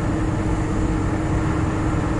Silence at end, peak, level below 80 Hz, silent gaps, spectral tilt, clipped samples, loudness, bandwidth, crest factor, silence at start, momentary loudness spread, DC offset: 0 s; -10 dBFS; -28 dBFS; none; -7.5 dB/octave; under 0.1%; -22 LUFS; 11.5 kHz; 12 dB; 0 s; 1 LU; under 0.1%